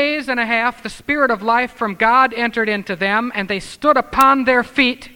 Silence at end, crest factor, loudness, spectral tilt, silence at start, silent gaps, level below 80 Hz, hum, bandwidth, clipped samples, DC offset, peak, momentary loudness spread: 0.05 s; 16 dB; -16 LUFS; -4.5 dB/octave; 0 s; none; -46 dBFS; none; 19.5 kHz; under 0.1%; under 0.1%; 0 dBFS; 8 LU